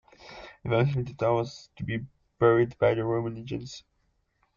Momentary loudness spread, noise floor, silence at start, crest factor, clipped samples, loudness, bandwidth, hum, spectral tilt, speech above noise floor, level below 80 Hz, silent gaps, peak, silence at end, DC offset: 22 LU; -72 dBFS; 0.25 s; 18 dB; under 0.1%; -27 LUFS; 7.2 kHz; none; -7.5 dB/octave; 45 dB; -56 dBFS; none; -10 dBFS; 0.8 s; under 0.1%